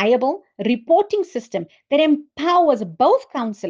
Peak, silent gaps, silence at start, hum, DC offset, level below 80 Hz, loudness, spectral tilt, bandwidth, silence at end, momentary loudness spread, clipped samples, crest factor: -4 dBFS; none; 0 s; none; under 0.1%; -68 dBFS; -19 LUFS; -6 dB/octave; 7.6 kHz; 0 s; 10 LU; under 0.1%; 14 dB